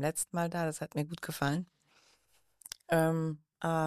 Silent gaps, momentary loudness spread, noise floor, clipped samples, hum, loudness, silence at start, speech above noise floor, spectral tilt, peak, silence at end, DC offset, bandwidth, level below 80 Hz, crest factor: none; 18 LU; -72 dBFS; under 0.1%; none; -34 LUFS; 0 s; 39 dB; -5.5 dB/octave; -16 dBFS; 0 s; under 0.1%; 15 kHz; -70 dBFS; 18 dB